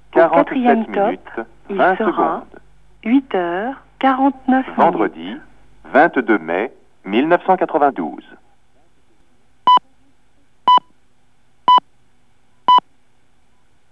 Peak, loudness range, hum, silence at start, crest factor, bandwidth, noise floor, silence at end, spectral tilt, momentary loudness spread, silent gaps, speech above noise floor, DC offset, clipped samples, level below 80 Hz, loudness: 0 dBFS; 2 LU; none; 0.15 s; 18 dB; 7.4 kHz; -61 dBFS; 1.1 s; -7 dB/octave; 14 LU; none; 44 dB; 0.4%; under 0.1%; -58 dBFS; -16 LUFS